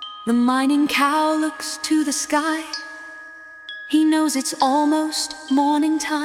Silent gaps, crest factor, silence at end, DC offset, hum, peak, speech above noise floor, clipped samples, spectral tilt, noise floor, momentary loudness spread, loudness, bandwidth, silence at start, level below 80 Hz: none; 16 dB; 0 s; under 0.1%; none; -4 dBFS; 21 dB; under 0.1%; -2 dB/octave; -40 dBFS; 17 LU; -20 LUFS; 16 kHz; 0 s; -64 dBFS